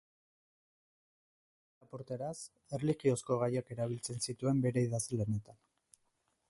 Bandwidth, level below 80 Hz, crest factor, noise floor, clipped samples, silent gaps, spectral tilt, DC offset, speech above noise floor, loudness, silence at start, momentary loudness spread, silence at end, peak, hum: 11.5 kHz; -68 dBFS; 20 dB; -79 dBFS; under 0.1%; none; -6 dB/octave; under 0.1%; 44 dB; -36 LUFS; 1.95 s; 12 LU; 0.95 s; -18 dBFS; none